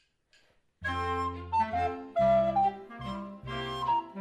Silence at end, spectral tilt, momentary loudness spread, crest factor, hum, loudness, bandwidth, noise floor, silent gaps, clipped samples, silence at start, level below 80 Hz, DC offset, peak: 0 s; -6.5 dB/octave; 14 LU; 14 dB; none; -30 LUFS; 10 kHz; -67 dBFS; none; under 0.1%; 0.8 s; -52 dBFS; under 0.1%; -16 dBFS